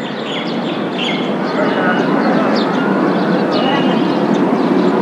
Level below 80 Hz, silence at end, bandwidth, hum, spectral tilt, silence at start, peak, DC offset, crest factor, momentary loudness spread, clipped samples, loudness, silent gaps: -74 dBFS; 0 s; 11 kHz; none; -6.5 dB/octave; 0 s; -2 dBFS; under 0.1%; 12 dB; 5 LU; under 0.1%; -15 LUFS; none